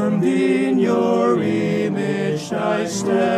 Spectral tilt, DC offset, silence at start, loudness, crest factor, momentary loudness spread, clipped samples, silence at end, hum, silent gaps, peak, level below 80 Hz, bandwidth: -6 dB/octave; under 0.1%; 0 s; -19 LUFS; 14 dB; 4 LU; under 0.1%; 0 s; none; none; -6 dBFS; -64 dBFS; 13.5 kHz